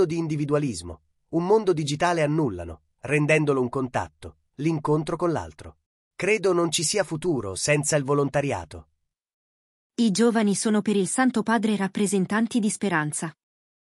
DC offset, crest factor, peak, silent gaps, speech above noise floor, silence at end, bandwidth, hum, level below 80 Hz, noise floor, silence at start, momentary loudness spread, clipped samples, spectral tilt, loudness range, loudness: under 0.1%; 16 dB; -8 dBFS; 5.86-6.11 s, 9.34-9.90 s; over 66 dB; 0.55 s; 13.5 kHz; none; -58 dBFS; under -90 dBFS; 0 s; 11 LU; under 0.1%; -5 dB/octave; 3 LU; -24 LUFS